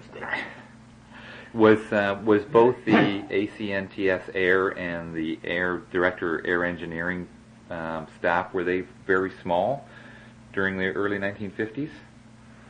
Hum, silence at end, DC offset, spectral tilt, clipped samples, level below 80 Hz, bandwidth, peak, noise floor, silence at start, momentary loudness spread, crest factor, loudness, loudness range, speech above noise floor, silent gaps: none; 0.1 s; under 0.1%; -7 dB/octave; under 0.1%; -60 dBFS; 9.8 kHz; -6 dBFS; -49 dBFS; 0 s; 15 LU; 20 dB; -25 LUFS; 5 LU; 25 dB; none